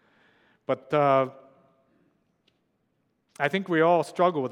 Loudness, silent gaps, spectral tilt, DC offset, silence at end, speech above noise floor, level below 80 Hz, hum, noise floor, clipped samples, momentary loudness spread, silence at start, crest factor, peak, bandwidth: -25 LUFS; none; -6.5 dB/octave; under 0.1%; 0 s; 50 dB; -82 dBFS; none; -73 dBFS; under 0.1%; 10 LU; 0.7 s; 20 dB; -8 dBFS; 12 kHz